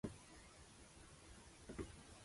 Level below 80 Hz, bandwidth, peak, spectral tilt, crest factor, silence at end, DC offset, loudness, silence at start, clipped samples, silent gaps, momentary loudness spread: -66 dBFS; 11.5 kHz; -34 dBFS; -5 dB/octave; 22 dB; 0 s; under 0.1%; -58 LUFS; 0.05 s; under 0.1%; none; 8 LU